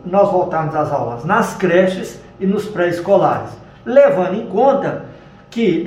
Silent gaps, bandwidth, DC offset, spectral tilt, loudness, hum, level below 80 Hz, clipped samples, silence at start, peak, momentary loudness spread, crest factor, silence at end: none; 13.5 kHz; under 0.1%; -7 dB/octave; -16 LUFS; none; -50 dBFS; under 0.1%; 0.05 s; 0 dBFS; 13 LU; 16 dB; 0 s